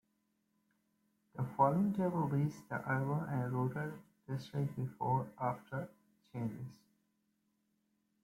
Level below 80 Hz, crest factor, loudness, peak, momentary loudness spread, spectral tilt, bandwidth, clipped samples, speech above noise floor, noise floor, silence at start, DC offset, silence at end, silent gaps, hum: -72 dBFS; 22 dB; -37 LUFS; -18 dBFS; 15 LU; -9 dB/octave; 15.5 kHz; under 0.1%; 44 dB; -80 dBFS; 1.35 s; under 0.1%; 1.5 s; none; none